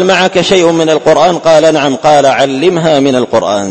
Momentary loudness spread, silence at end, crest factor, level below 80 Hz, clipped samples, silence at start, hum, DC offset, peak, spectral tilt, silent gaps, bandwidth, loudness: 3 LU; 0 s; 8 dB; -44 dBFS; 0.8%; 0 s; none; under 0.1%; 0 dBFS; -4.5 dB/octave; none; 11 kHz; -8 LUFS